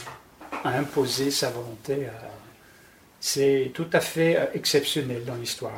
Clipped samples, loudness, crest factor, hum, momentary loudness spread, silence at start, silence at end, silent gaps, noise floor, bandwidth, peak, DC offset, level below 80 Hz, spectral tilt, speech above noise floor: under 0.1%; -25 LUFS; 20 dB; none; 14 LU; 0 s; 0 s; none; -54 dBFS; 19 kHz; -6 dBFS; under 0.1%; -62 dBFS; -4 dB/octave; 28 dB